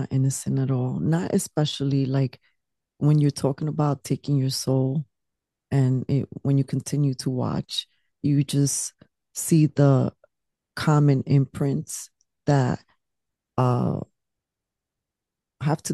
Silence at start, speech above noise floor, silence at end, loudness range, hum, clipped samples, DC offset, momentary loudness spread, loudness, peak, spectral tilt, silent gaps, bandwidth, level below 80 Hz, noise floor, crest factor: 0 s; 64 dB; 0 s; 4 LU; none; under 0.1%; under 0.1%; 11 LU; -24 LUFS; -6 dBFS; -6.5 dB/octave; none; 12.5 kHz; -60 dBFS; -86 dBFS; 18 dB